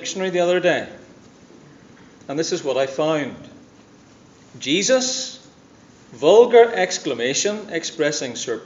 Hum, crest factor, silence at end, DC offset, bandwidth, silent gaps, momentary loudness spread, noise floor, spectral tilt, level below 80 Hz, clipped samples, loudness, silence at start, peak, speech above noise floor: none; 20 dB; 0 s; under 0.1%; 7.8 kHz; none; 14 LU; -49 dBFS; -3 dB/octave; -66 dBFS; under 0.1%; -19 LUFS; 0 s; 0 dBFS; 30 dB